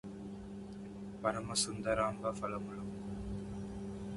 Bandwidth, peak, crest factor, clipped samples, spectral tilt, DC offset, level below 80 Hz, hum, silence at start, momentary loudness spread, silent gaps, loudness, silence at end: 11.5 kHz; -18 dBFS; 22 dB; under 0.1%; -4 dB/octave; under 0.1%; -56 dBFS; none; 0.05 s; 13 LU; none; -39 LUFS; 0 s